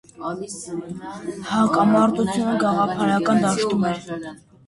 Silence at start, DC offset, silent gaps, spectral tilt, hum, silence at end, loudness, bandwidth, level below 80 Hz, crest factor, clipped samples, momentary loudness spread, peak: 0.2 s; under 0.1%; none; -5.5 dB/octave; none; 0.3 s; -21 LUFS; 11.5 kHz; -56 dBFS; 16 dB; under 0.1%; 15 LU; -6 dBFS